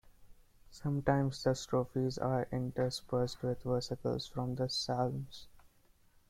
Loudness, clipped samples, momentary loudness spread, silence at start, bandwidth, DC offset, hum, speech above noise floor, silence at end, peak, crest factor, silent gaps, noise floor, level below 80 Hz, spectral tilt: -36 LUFS; under 0.1%; 6 LU; 0.2 s; 14.5 kHz; under 0.1%; none; 32 dB; 0.65 s; -14 dBFS; 22 dB; none; -66 dBFS; -58 dBFS; -6 dB/octave